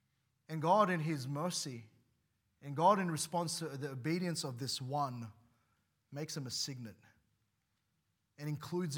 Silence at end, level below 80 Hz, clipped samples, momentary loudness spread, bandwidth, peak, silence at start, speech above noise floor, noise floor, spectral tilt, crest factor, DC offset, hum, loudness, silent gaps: 0 s; -84 dBFS; under 0.1%; 18 LU; 18 kHz; -16 dBFS; 0.5 s; 46 dB; -82 dBFS; -4.5 dB/octave; 22 dB; under 0.1%; none; -36 LUFS; none